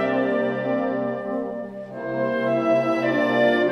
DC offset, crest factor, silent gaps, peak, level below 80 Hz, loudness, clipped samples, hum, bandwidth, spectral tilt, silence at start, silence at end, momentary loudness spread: under 0.1%; 16 dB; none; -8 dBFS; -62 dBFS; -23 LUFS; under 0.1%; none; 11 kHz; -7 dB/octave; 0 s; 0 s; 11 LU